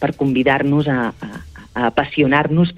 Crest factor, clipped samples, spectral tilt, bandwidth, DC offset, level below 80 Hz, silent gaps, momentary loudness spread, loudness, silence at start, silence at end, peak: 16 dB; under 0.1%; -8 dB/octave; 8 kHz; under 0.1%; -44 dBFS; none; 17 LU; -17 LUFS; 0 s; 0 s; -2 dBFS